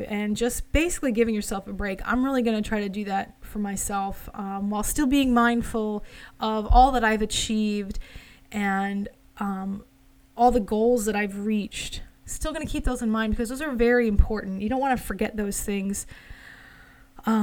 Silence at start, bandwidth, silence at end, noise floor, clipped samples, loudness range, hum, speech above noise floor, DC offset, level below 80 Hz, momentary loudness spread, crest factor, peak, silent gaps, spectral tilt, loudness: 0 s; 18 kHz; 0 s; -51 dBFS; under 0.1%; 5 LU; none; 26 dB; under 0.1%; -34 dBFS; 14 LU; 20 dB; -4 dBFS; none; -4.5 dB/octave; -25 LUFS